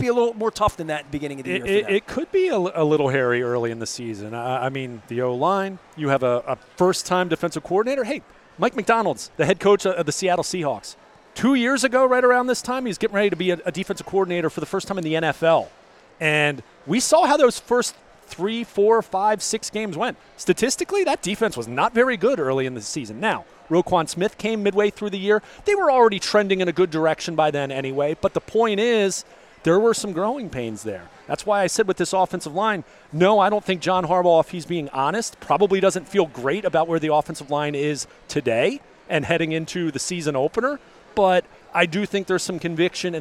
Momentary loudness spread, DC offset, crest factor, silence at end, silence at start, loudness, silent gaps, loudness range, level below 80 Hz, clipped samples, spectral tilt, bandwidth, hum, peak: 10 LU; under 0.1%; 20 dB; 0 s; 0 s; -22 LUFS; none; 3 LU; -54 dBFS; under 0.1%; -4.5 dB/octave; 15.5 kHz; none; -2 dBFS